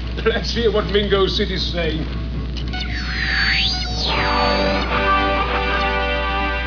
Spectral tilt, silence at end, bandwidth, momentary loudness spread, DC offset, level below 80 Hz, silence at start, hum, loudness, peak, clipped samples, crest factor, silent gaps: -5 dB/octave; 0 s; 5.4 kHz; 8 LU; 0.4%; -26 dBFS; 0 s; none; -19 LUFS; -4 dBFS; under 0.1%; 14 dB; none